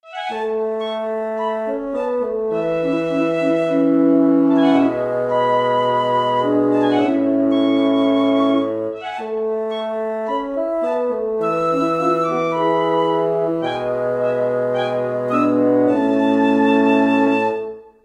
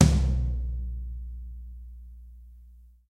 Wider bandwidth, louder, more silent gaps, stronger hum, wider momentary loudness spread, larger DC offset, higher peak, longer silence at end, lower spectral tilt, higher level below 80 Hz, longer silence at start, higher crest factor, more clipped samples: second, 8.2 kHz vs 11 kHz; first, -18 LUFS vs -30 LUFS; neither; neither; second, 9 LU vs 24 LU; neither; about the same, -2 dBFS vs -4 dBFS; about the same, 0.25 s vs 0.35 s; about the same, -7 dB/octave vs -6.5 dB/octave; second, -58 dBFS vs -30 dBFS; about the same, 0.05 s vs 0 s; second, 16 dB vs 24 dB; neither